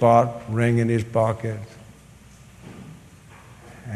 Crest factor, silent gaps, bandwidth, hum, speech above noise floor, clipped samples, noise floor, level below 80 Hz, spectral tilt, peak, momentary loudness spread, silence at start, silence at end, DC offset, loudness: 20 dB; none; 12 kHz; none; 28 dB; under 0.1%; -48 dBFS; -54 dBFS; -8 dB/octave; -4 dBFS; 25 LU; 0 s; 0 s; under 0.1%; -22 LUFS